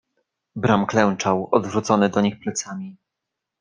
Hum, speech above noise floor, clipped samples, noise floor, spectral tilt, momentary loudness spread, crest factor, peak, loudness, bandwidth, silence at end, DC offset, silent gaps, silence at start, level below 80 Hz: none; 62 dB; under 0.1%; -83 dBFS; -5.5 dB/octave; 15 LU; 20 dB; -2 dBFS; -21 LUFS; 9.8 kHz; 0.65 s; under 0.1%; none; 0.55 s; -58 dBFS